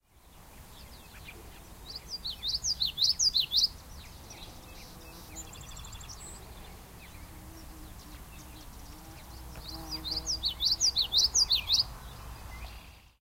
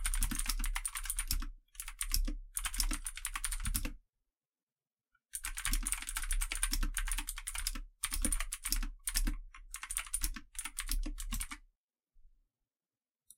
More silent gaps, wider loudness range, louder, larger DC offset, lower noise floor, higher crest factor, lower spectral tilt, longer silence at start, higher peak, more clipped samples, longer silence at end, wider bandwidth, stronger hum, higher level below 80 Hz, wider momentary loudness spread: second, none vs 4.63-4.67 s, 11.78-11.88 s; first, 20 LU vs 4 LU; first, -27 LUFS vs -38 LUFS; neither; second, -55 dBFS vs under -90 dBFS; about the same, 22 dB vs 26 dB; about the same, -0.5 dB/octave vs -1 dB/octave; first, 0.15 s vs 0 s; about the same, -12 dBFS vs -12 dBFS; neither; second, 0.2 s vs 1.1 s; about the same, 16 kHz vs 17 kHz; neither; second, -50 dBFS vs -40 dBFS; first, 25 LU vs 8 LU